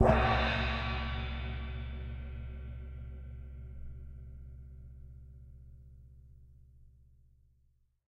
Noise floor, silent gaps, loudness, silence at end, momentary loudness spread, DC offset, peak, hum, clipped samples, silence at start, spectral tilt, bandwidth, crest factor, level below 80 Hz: -71 dBFS; none; -36 LUFS; 1.2 s; 25 LU; under 0.1%; -12 dBFS; none; under 0.1%; 0 s; -7 dB/octave; 6.8 kHz; 24 dB; -42 dBFS